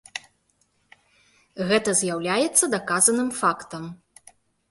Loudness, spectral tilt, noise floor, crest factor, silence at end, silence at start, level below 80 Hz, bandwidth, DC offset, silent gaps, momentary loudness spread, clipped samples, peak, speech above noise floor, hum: -21 LUFS; -2.5 dB/octave; -68 dBFS; 22 dB; 0.75 s; 0.15 s; -66 dBFS; 12 kHz; under 0.1%; none; 18 LU; under 0.1%; -4 dBFS; 45 dB; none